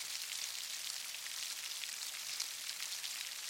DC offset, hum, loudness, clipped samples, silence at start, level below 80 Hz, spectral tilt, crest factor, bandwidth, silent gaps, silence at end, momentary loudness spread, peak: under 0.1%; none; -40 LUFS; under 0.1%; 0 s; under -90 dBFS; 3.5 dB/octave; 24 dB; 17 kHz; none; 0 s; 1 LU; -20 dBFS